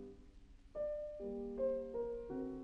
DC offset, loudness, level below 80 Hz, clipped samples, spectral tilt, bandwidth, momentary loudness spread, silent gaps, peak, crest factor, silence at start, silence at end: under 0.1%; -43 LUFS; -60 dBFS; under 0.1%; -9 dB/octave; 7.2 kHz; 13 LU; none; -28 dBFS; 14 dB; 0 s; 0 s